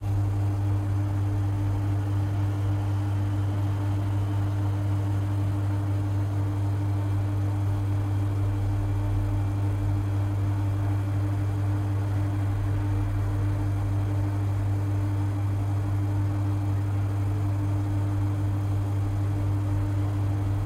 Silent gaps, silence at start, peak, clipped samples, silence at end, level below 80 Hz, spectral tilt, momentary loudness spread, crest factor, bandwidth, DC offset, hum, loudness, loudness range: none; 0 s; -16 dBFS; under 0.1%; 0 s; -40 dBFS; -8.5 dB/octave; 1 LU; 10 dB; 9.4 kHz; under 0.1%; none; -27 LUFS; 0 LU